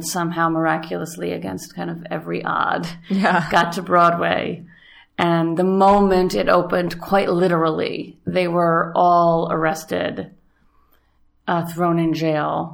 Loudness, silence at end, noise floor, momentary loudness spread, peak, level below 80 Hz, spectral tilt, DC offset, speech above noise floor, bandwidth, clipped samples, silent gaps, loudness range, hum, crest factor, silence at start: -19 LUFS; 0 s; -59 dBFS; 13 LU; -2 dBFS; -48 dBFS; -6 dB/octave; under 0.1%; 40 dB; 18.5 kHz; under 0.1%; none; 5 LU; none; 18 dB; 0 s